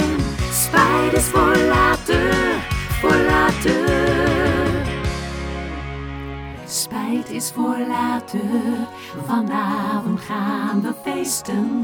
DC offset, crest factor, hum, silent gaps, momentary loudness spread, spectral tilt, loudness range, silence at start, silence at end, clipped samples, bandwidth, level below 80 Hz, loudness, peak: under 0.1%; 18 dB; none; none; 12 LU; -4.5 dB/octave; 7 LU; 0 s; 0 s; under 0.1%; over 20 kHz; -32 dBFS; -19 LUFS; 0 dBFS